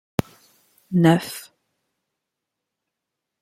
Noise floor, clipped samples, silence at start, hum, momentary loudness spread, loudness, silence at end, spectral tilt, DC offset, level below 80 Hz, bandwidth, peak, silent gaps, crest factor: -83 dBFS; under 0.1%; 0.9 s; none; 17 LU; -20 LUFS; 2 s; -6.5 dB/octave; under 0.1%; -58 dBFS; 16 kHz; -2 dBFS; none; 24 dB